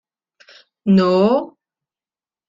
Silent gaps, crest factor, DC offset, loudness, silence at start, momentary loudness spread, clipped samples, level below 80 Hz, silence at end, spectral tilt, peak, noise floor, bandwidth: none; 16 dB; under 0.1%; -16 LUFS; 0.85 s; 14 LU; under 0.1%; -60 dBFS; 1.05 s; -8.5 dB/octave; -4 dBFS; under -90 dBFS; 7.4 kHz